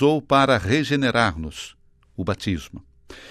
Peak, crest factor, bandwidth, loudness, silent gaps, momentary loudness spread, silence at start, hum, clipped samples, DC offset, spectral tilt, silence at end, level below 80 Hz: -6 dBFS; 18 dB; 14 kHz; -21 LUFS; none; 20 LU; 0 s; none; under 0.1%; under 0.1%; -5.5 dB/octave; 0 s; -46 dBFS